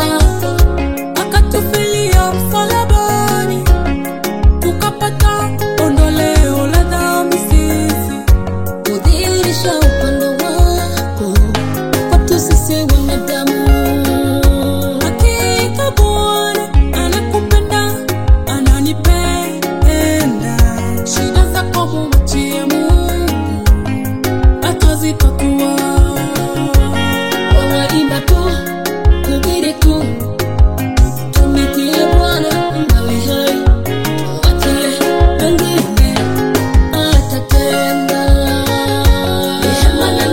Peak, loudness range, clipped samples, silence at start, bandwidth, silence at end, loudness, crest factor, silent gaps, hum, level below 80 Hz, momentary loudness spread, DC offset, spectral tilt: 0 dBFS; 1 LU; 0.2%; 0 s; 17 kHz; 0 s; -13 LUFS; 12 dB; none; none; -14 dBFS; 4 LU; 3%; -5 dB/octave